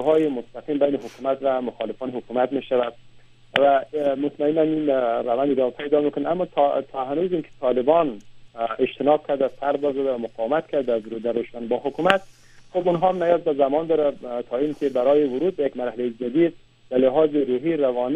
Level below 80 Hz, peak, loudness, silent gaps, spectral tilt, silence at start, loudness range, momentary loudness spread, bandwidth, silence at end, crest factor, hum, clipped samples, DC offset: -60 dBFS; 0 dBFS; -23 LUFS; none; -7 dB/octave; 0 s; 2 LU; 8 LU; 9 kHz; 0 s; 22 dB; none; under 0.1%; under 0.1%